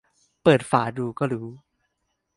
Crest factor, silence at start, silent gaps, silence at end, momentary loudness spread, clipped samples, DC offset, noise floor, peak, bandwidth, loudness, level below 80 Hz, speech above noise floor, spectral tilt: 22 dB; 0.45 s; none; 0.8 s; 12 LU; under 0.1%; under 0.1%; -76 dBFS; -4 dBFS; 11.5 kHz; -23 LUFS; -60 dBFS; 54 dB; -6.5 dB/octave